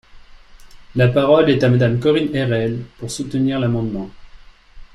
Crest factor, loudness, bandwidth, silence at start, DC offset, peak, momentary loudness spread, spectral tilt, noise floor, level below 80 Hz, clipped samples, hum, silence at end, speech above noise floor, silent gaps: 16 dB; -17 LUFS; 12 kHz; 0.15 s; under 0.1%; -2 dBFS; 14 LU; -7 dB/octave; -42 dBFS; -42 dBFS; under 0.1%; none; 0.1 s; 25 dB; none